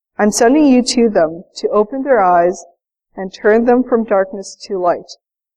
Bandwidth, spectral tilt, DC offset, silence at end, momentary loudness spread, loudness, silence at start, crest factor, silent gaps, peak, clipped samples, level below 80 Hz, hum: 14.5 kHz; -4.5 dB/octave; under 0.1%; 0.45 s; 13 LU; -14 LUFS; 0.2 s; 12 dB; none; -2 dBFS; under 0.1%; -48 dBFS; none